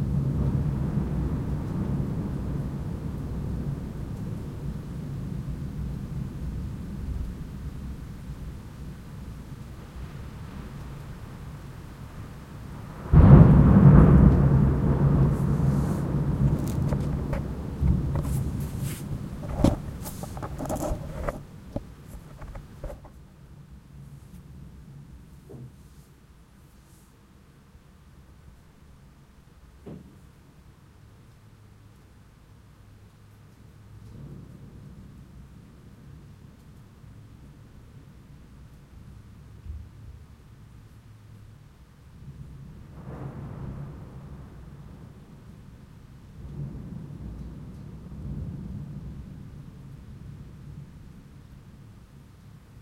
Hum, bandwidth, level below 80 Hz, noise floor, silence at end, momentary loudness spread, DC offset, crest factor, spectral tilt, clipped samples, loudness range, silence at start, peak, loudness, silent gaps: none; 15.5 kHz; -34 dBFS; -54 dBFS; 0 s; 25 LU; under 0.1%; 28 dB; -9 dB/octave; under 0.1%; 29 LU; 0 s; 0 dBFS; -25 LUFS; none